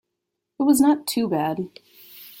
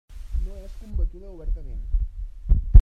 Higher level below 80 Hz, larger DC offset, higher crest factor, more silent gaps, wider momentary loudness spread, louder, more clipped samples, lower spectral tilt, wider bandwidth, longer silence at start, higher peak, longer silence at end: second, -64 dBFS vs -22 dBFS; neither; about the same, 16 dB vs 20 dB; neither; first, 21 LU vs 12 LU; first, -21 LUFS vs -30 LUFS; neither; second, -4.5 dB/octave vs -9.5 dB/octave; first, 17 kHz vs 1.2 kHz; first, 0.6 s vs 0.1 s; second, -6 dBFS vs 0 dBFS; about the same, 0.1 s vs 0 s